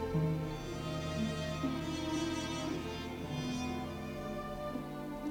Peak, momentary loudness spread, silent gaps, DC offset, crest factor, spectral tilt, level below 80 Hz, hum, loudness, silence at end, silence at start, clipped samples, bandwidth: -22 dBFS; 5 LU; none; under 0.1%; 16 dB; -5.5 dB/octave; -54 dBFS; none; -38 LUFS; 0 s; 0 s; under 0.1%; 19.5 kHz